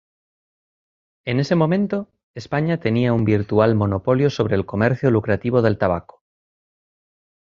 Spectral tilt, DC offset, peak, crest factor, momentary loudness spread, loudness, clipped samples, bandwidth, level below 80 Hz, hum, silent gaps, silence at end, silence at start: -8.5 dB/octave; under 0.1%; -2 dBFS; 18 dB; 8 LU; -20 LUFS; under 0.1%; 7.4 kHz; -46 dBFS; none; 2.23-2.34 s; 1.55 s; 1.25 s